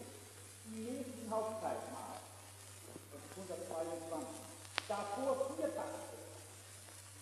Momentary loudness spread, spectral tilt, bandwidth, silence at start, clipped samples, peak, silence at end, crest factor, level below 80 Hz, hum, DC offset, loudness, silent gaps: 14 LU; -4 dB/octave; 14.5 kHz; 0 s; under 0.1%; -12 dBFS; 0 s; 32 dB; -86 dBFS; none; under 0.1%; -44 LUFS; none